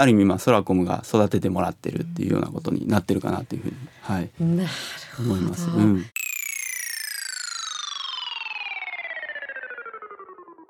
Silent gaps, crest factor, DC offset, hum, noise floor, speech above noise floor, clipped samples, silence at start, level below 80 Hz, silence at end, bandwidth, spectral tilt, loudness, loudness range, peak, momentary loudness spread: none; 22 dB; under 0.1%; none; -44 dBFS; 22 dB; under 0.1%; 0 s; -62 dBFS; 0.05 s; 19 kHz; -5 dB/octave; -25 LUFS; 6 LU; -2 dBFS; 13 LU